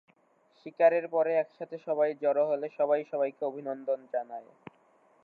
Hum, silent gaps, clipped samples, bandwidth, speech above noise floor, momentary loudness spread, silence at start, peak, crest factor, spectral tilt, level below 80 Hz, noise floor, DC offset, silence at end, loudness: none; none; under 0.1%; 4.8 kHz; 37 dB; 16 LU; 0.65 s; -10 dBFS; 20 dB; -8 dB/octave; under -90 dBFS; -67 dBFS; under 0.1%; 0.8 s; -29 LUFS